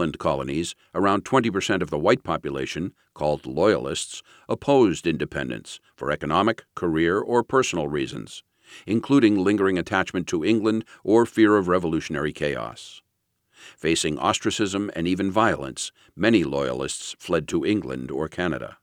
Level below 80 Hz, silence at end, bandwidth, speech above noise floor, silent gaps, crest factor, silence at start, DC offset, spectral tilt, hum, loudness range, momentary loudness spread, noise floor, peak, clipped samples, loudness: -52 dBFS; 0.1 s; 13 kHz; 51 dB; none; 20 dB; 0 s; under 0.1%; -5 dB/octave; none; 3 LU; 12 LU; -74 dBFS; -4 dBFS; under 0.1%; -23 LUFS